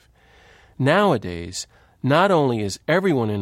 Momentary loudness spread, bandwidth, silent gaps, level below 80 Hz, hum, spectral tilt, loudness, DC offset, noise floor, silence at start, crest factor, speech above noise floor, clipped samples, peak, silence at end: 14 LU; 15.5 kHz; none; -54 dBFS; none; -5.5 dB/octave; -20 LUFS; under 0.1%; -53 dBFS; 0.8 s; 16 dB; 33 dB; under 0.1%; -4 dBFS; 0 s